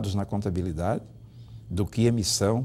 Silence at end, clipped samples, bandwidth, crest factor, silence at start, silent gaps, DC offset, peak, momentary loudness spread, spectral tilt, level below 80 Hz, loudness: 0 s; under 0.1%; 16 kHz; 16 dB; 0 s; none; under 0.1%; -10 dBFS; 21 LU; -5.5 dB/octave; -46 dBFS; -27 LUFS